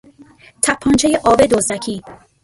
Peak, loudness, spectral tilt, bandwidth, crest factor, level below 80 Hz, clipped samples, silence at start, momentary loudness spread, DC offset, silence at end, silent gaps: 0 dBFS; -15 LUFS; -3.5 dB/octave; 12 kHz; 16 dB; -42 dBFS; under 0.1%; 0.65 s; 12 LU; under 0.1%; 0.3 s; none